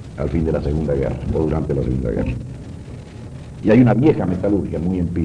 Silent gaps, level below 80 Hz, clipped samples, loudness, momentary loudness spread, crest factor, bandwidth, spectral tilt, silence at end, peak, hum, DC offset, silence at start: none; -32 dBFS; under 0.1%; -19 LUFS; 21 LU; 16 dB; 10 kHz; -9.5 dB/octave; 0 s; -4 dBFS; none; under 0.1%; 0 s